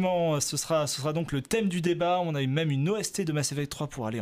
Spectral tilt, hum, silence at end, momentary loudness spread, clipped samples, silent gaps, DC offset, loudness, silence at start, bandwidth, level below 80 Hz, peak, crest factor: -5 dB/octave; none; 0 s; 5 LU; under 0.1%; none; under 0.1%; -28 LUFS; 0 s; 15.5 kHz; -58 dBFS; -14 dBFS; 14 dB